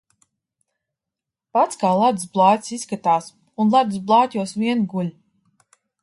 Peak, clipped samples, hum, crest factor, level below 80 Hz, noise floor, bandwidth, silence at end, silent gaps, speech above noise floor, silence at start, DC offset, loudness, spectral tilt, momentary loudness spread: -2 dBFS; under 0.1%; none; 20 dB; -68 dBFS; -86 dBFS; 11.5 kHz; 0.9 s; none; 67 dB; 1.55 s; under 0.1%; -20 LUFS; -5.5 dB/octave; 8 LU